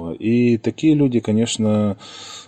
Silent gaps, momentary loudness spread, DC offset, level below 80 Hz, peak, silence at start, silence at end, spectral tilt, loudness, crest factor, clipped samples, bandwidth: none; 7 LU; under 0.1%; -56 dBFS; -6 dBFS; 0 s; 0.05 s; -6 dB/octave; -18 LUFS; 12 dB; under 0.1%; 9.4 kHz